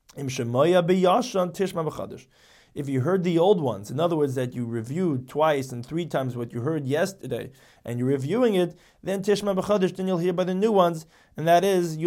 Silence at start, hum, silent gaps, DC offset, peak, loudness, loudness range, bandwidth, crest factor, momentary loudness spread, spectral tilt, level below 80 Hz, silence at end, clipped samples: 0.15 s; none; none; under 0.1%; -8 dBFS; -24 LUFS; 3 LU; 16.5 kHz; 16 dB; 13 LU; -6.5 dB/octave; -62 dBFS; 0 s; under 0.1%